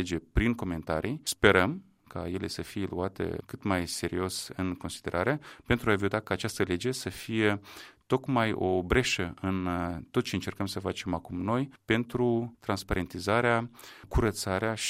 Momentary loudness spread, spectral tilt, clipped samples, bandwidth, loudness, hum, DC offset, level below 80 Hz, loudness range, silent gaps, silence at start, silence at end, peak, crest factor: 9 LU; -5 dB/octave; under 0.1%; 16 kHz; -30 LUFS; none; under 0.1%; -44 dBFS; 3 LU; none; 0 s; 0 s; -4 dBFS; 26 dB